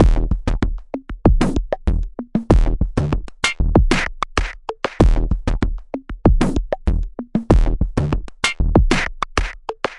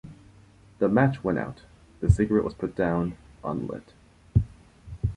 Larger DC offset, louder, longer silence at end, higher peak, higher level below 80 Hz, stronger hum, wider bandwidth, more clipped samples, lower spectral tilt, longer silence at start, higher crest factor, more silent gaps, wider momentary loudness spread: neither; first, -20 LUFS vs -27 LUFS; about the same, 0 s vs 0 s; about the same, -2 dBFS vs -4 dBFS; first, -20 dBFS vs -38 dBFS; neither; about the same, 11 kHz vs 10.5 kHz; neither; second, -6 dB/octave vs -9 dB/octave; about the same, 0 s vs 0.05 s; second, 16 dB vs 22 dB; neither; second, 9 LU vs 16 LU